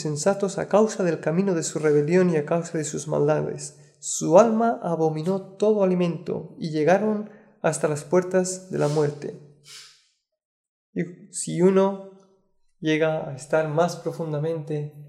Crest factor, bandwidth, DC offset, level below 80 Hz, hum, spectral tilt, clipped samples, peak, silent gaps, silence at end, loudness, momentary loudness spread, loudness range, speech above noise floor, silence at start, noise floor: 22 dB; 13 kHz; under 0.1%; -70 dBFS; none; -6 dB/octave; under 0.1%; -2 dBFS; 10.45-10.93 s; 0 s; -23 LUFS; 12 LU; 5 LU; 43 dB; 0 s; -66 dBFS